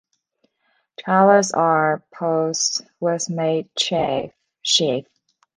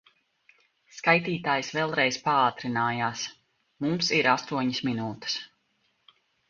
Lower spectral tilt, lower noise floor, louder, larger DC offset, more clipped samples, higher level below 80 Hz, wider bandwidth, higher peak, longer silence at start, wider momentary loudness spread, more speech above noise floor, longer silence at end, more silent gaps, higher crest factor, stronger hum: about the same, -3.5 dB/octave vs -4 dB/octave; second, -68 dBFS vs -72 dBFS; first, -19 LUFS vs -26 LUFS; neither; neither; first, -62 dBFS vs -68 dBFS; first, 10.5 kHz vs 7.4 kHz; first, -2 dBFS vs -6 dBFS; about the same, 1 s vs 0.95 s; first, 12 LU vs 9 LU; first, 49 dB vs 45 dB; second, 0.55 s vs 1.05 s; neither; second, 18 dB vs 24 dB; neither